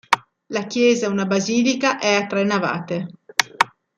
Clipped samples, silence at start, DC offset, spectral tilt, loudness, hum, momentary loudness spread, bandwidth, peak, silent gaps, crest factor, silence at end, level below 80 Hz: under 0.1%; 0.1 s; under 0.1%; -4 dB/octave; -20 LUFS; none; 9 LU; 16 kHz; 0 dBFS; none; 20 dB; 0.3 s; -64 dBFS